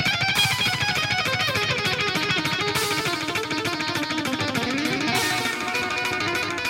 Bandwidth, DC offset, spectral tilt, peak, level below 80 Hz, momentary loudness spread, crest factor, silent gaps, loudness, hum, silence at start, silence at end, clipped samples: 16.5 kHz; under 0.1%; -3 dB/octave; -8 dBFS; -54 dBFS; 5 LU; 16 dB; none; -22 LUFS; none; 0 s; 0 s; under 0.1%